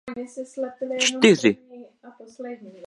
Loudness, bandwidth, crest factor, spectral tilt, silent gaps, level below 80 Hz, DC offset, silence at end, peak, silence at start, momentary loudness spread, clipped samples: -20 LUFS; 11.5 kHz; 22 dB; -3.5 dB/octave; none; -70 dBFS; under 0.1%; 0 s; -2 dBFS; 0.05 s; 21 LU; under 0.1%